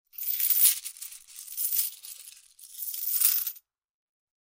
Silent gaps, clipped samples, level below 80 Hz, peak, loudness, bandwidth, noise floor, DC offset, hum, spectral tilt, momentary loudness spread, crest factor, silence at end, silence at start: none; under 0.1%; -82 dBFS; -6 dBFS; -24 LUFS; 16.5 kHz; -50 dBFS; under 0.1%; none; 7.5 dB/octave; 22 LU; 24 dB; 0.85 s; 0.15 s